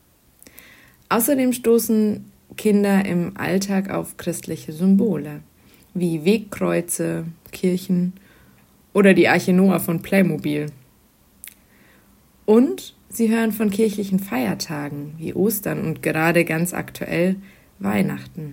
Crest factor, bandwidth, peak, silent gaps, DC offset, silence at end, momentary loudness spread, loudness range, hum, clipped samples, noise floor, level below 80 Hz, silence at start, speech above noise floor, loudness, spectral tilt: 20 dB; 16.5 kHz; -2 dBFS; none; under 0.1%; 0 s; 14 LU; 4 LU; none; under 0.1%; -56 dBFS; -58 dBFS; 1.1 s; 36 dB; -20 LUFS; -6 dB/octave